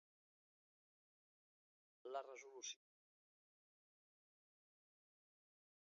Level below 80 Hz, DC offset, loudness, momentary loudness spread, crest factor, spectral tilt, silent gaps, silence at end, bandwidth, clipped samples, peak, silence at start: under -90 dBFS; under 0.1%; -54 LUFS; 8 LU; 26 dB; 2.5 dB/octave; none; 3.2 s; 7.2 kHz; under 0.1%; -36 dBFS; 2.05 s